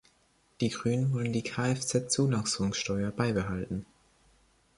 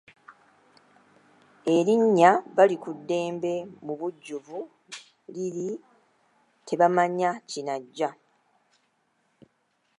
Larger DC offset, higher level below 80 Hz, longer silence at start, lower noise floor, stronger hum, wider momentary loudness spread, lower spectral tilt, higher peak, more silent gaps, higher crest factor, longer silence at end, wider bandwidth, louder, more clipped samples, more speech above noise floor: neither; first, -56 dBFS vs -82 dBFS; first, 0.6 s vs 0.3 s; second, -68 dBFS vs -72 dBFS; neither; second, 6 LU vs 20 LU; about the same, -5 dB/octave vs -5.5 dB/octave; second, -12 dBFS vs -4 dBFS; neither; second, 18 dB vs 24 dB; second, 0.95 s vs 1.9 s; about the same, 11.5 kHz vs 11.5 kHz; second, -30 LUFS vs -25 LUFS; neither; second, 38 dB vs 47 dB